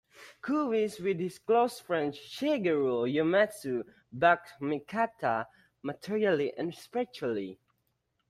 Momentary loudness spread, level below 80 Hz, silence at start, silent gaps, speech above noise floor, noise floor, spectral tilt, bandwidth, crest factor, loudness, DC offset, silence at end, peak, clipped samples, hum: 11 LU; -72 dBFS; 0.2 s; none; 48 dB; -78 dBFS; -6 dB/octave; 14.5 kHz; 20 dB; -30 LUFS; under 0.1%; 0.75 s; -10 dBFS; under 0.1%; none